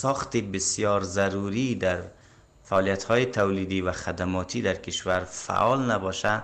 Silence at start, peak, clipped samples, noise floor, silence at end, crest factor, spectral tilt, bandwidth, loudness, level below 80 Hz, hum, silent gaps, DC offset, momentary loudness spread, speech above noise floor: 0 s; -12 dBFS; under 0.1%; -54 dBFS; 0 s; 16 dB; -4.5 dB/octave; 10 kHz; -26 LUFS; -54 dBFS; none; none; under 0.1%; 6 LU; 28 dB